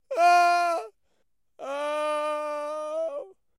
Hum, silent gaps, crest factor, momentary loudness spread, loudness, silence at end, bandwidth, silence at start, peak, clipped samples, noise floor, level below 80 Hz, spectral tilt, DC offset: none; none; 16 dB; 17 LU; -26 LUFS; 0.3 s; 15.5 kHz; 0.1 s; -10 dBFS; under 0.1%; -76 dBFS; -82 dBFS; 0 dB/octave; under 0.1%